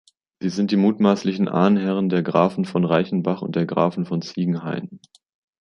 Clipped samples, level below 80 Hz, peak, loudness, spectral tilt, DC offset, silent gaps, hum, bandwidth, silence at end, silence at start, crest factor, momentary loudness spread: under 0.1%; -62 dBFS; -4 dBFS; -21 LUFS; -7.5 dB/octave; under 0.1%; none; none; 7 kHz; 0.65 s; 0.4 s; 18 dB; 9 LU